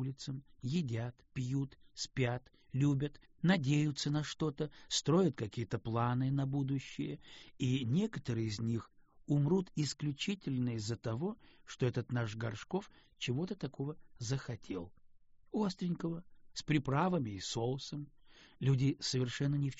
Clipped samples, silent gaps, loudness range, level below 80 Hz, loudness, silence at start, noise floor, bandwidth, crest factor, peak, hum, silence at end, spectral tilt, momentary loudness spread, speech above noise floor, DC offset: under 0.1%; none; 6 LU; -64 dBFS; -37 LUFS; 0 s; -61 dBFS; 8 kHz; 20 dB; -18 dBFS; none; 0 s; -6 dB/octave; 12 LU; 25 dB; under 0.1%